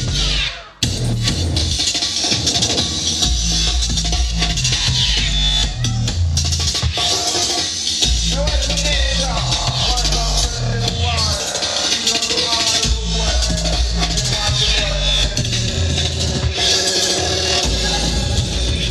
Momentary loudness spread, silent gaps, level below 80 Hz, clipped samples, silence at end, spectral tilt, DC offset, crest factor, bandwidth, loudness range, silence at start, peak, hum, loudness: 4 LU; none; -24 dBFS; under 0.1%; 0 s; -2.5 dB/octave; under 0.1%; 16 dB; 13.5 kHz; 1 LU; 0 s; -2 dBFS; none; -16 LUFS